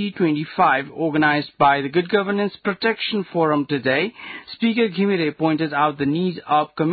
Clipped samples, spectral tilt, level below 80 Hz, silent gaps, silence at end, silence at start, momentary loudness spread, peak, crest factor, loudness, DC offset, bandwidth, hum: under 0.1%; -11 dB/octave; -62 dBFS; none; 0 s; 0 s; 5 LU; -4 dBFS; 16 dB; -20 LUFS; under 0.1%; 4.8 kHz; none